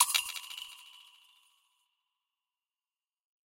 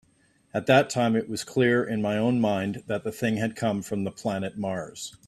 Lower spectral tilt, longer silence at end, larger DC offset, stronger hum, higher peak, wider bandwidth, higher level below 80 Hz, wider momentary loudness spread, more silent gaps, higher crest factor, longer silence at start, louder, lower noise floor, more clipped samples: second, 5 dB/octave vs -5.5 dB/octave; first, 2.45 s vs 0.15 s; neither; neither; about the same, -8 dBFS vs -6 dBFS; first, 16.5 kHz vs 14.5 kHz; second, -86 dBFS vs -62 dBFS; first, 24 LU vs 10 LU; neither; first, 30 dB vs 20 dB; second, 0 s vs 0.55 s; second, -34 LUFS vs -26 LUFS; first, under -90 dBFS vs -64 dBFS; neither